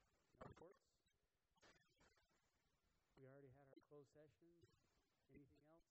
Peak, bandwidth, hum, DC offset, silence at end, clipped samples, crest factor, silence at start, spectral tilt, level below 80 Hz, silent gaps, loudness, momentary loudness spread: -48 dBFS; 8 kHz; none; under 0.1%; 0 s; under 0.1%; 24 dB; 0 s; -5.5 dB/octave; -86 dBFS; none; -68 LUFS; 5 LU